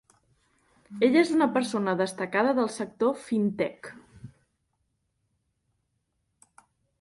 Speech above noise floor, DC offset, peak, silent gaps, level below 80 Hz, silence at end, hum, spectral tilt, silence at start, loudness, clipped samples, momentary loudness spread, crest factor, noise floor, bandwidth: 51 dB; under 0.1%; -8 dBFS; none; -70 dBFS; 2.75 s; none; -5.5 dB/octave; 0.9 s; -26 LUFS; under 0.1%; 10 LU; 20 dB; -77 dBFS; 11.5 kHz